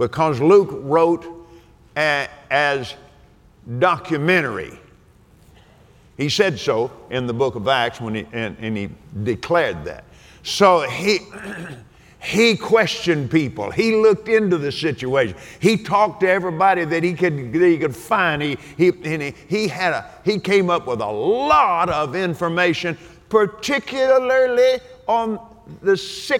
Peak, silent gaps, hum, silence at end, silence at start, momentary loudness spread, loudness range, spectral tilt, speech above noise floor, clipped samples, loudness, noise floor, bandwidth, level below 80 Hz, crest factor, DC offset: -2 dBFS; none; none; 0 s; 0 s; 12 LU; 4 LU; -5 dB/octave; 32 dB; under 0.1%; -19 LUFS; -51 dBFS; 17 kHz; -52 dBFS; 18 dB; under 0.1%